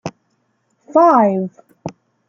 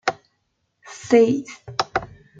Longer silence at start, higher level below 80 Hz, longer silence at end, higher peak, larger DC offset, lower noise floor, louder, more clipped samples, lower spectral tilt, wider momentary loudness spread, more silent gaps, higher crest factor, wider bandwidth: about the same, 0.05 s vs 0.05 s; second, -66 dBFS vs -56 dBFS; about the same, 0.4 s vs 0.35 s; about the same, -2 dBFS vs -4 dBFS; neither; second, -65 dBFS vs -72 dBFS; first, -14 LUFS vs -21 LUFS; neither; first, -8 dB/octave vs -5 dB/octave; first, 22 LU vs 18 LU; neither; about the same, 16 dB vs 20 dB; about the same, 7.2 kHz vs 7.8 kHz